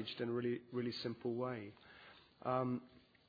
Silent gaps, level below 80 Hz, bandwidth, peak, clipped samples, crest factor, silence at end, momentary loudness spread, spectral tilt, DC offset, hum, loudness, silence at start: none; -80 dBFS; 5 kHz; -24 dBFS; under 0.1%; 18 dB; 0.3 s; 20 LU; -5 dB/octave; under 0.1%; none; -42 LUFS; 0 s